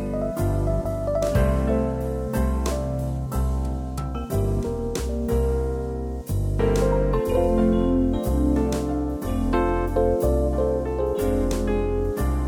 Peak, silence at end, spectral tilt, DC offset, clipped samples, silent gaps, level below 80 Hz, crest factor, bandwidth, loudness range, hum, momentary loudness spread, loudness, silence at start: -8 dBFS; 0 s; -7.5 dB/octave; under 0.1%; under 0.1%; none; -28 dBFS; 14 dB; 17 kHz; 4 LU; none; 6 LU; -24 LUFS; 0 s